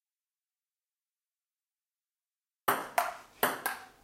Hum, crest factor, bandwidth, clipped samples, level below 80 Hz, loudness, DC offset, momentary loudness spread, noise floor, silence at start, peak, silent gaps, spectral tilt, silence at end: none; 28 dB; 16 kHz; under 0.1%; -78 dBFS; -33 LUFS; under 0.1%; 6 LU; under -90 dBFS; 2.65 s; -10 dBFS; none; -1.5 dB/octave; 0.15 s